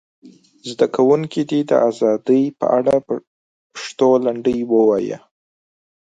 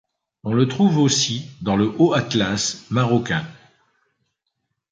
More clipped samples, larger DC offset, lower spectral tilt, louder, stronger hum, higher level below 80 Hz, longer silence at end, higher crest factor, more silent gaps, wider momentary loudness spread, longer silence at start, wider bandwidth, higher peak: neither; neither; first, -6.5 dB/octave vs -4.5 dB/octave; first, -17 LUFS vs -20 LUFS; neither; second, -60 dBFS vs -52 dBFS; second, 0.85 s vs 1.4 s; about the same, 16 dB vs 18 dB; first, 3.27-3.70 s vs none; first, 15 LU vs 9 LU; second, 0.25 s vs 0.45 s; about the same, 9.2 kHz vs 9.4 kHz; about the same, -2 dBFS vs -4 dBFS